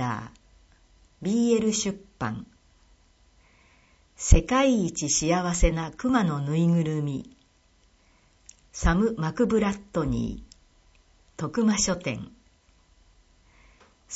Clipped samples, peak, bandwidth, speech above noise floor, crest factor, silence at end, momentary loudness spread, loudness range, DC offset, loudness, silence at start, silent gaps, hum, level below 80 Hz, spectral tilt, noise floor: under 0.1%; -2 dBFS; 8.2 kHz; 38 dB; 26 dB; 0 s; 13 LU; 6 LU; under 0.1%; -26 LUFS; 0 s; none; none; -34 dBFS; -5 dB/octave; -62 dBFS